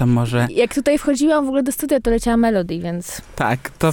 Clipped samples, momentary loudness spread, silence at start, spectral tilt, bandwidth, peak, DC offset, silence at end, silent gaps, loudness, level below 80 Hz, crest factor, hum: under 0.1%; 8 LU; 0 s; -6 dB/octave; 19 kHz; -4 dBFS; under 0.1%; 0 s; none; -18 LUFS; -36 dBFS; 14 dB; none